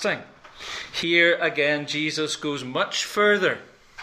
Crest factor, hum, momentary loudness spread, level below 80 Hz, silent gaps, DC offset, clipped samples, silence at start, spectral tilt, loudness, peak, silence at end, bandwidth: 20 dB; none; 15 LU; -62 dBFS; none; under 0.1%; under 0.1%; 0 s; -3 dB/octave; -22 LUFS; -4 dBFS; 0 s; 15.5 kHz